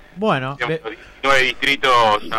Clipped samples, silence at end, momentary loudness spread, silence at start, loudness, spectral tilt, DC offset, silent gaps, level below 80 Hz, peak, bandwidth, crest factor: under 0.1%; 0 s; 10 LU; 0.15 s; -17 LUFS; -4 dB/octave; under 0.1%; none; -46 dBFS; -4 dBFS; 16 kHz; 14 dB